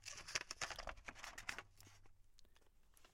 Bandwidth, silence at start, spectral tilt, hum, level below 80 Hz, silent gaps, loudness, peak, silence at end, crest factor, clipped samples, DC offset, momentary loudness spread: 16.5 kHz; 0 s; -0.5 dB/octave; none; -64 dBFS; none; -49 LUFS; -22 dBFS; 0 s; 32 dB; under 0.1%; under 0.1%; 19 LU